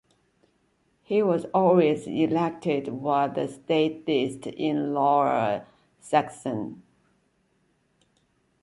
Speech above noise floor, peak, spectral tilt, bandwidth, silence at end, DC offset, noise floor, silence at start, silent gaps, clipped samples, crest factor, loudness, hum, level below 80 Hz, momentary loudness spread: 44 dB; -8 dBFS; -6.5 dB/octave; 11.5 kHz; 1.8 s; under 0.1%; -69 dBFS; 1.1 s; none; under 0.1%; 18 dB; -25 LUFS; none; -68 dBFS; 10 LU